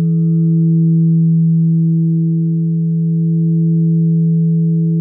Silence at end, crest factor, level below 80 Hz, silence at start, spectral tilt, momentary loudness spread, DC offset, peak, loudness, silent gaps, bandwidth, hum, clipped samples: 0 s; 6 dB; -66 dBFS; 0 s; -19.5 dB/octave; 3 LU; under 0.1%; -6 dBFS; -13 LUFS; none; 0.5 kHz; none; under 0.1%